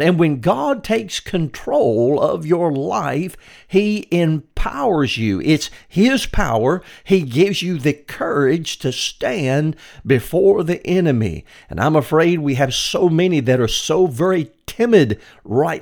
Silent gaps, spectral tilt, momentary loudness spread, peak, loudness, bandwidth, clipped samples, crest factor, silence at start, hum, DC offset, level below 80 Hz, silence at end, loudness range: none; -5.5 dB/octave; 8 LU; 0 dBFS; -18 LUFS; 19 kHz; under 0.1%; 18 dB; 0 s; none; under 0.1%; -36 dBFS; 0 s; 2 LU